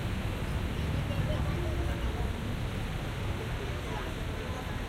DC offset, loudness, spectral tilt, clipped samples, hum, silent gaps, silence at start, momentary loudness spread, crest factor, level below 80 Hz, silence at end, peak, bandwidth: under 0.1%; -34 LUFS; -6 dB/octave; under 0.1%; none; none; 0 s; 4 LU; 14 dB; -36 dBFS; 0 s; -18 dBFS; 16 kHz